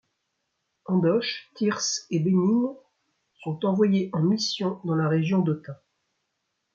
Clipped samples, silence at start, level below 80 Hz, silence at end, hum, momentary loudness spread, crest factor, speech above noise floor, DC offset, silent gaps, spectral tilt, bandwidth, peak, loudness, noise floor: under 0.1%; 0.9 s; -72 dBFS; 1 s; none; 10 LU; 16 dB; 54 dB; under 0.1%; none; -5.5 dB/octave; 7.6 kHz; -10 dBFS; -25 LUFS; -78 dBFS